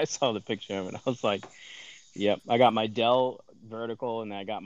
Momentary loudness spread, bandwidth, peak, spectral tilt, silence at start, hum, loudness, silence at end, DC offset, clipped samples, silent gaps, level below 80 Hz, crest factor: 21 LU; 8.2 kHz; -8 dBFS; -4.5 dB/octave; 0 s; none; -28 LUFS; 0 s; under 0.1%; under 0.1%; none; -78 dBFS; 20 dB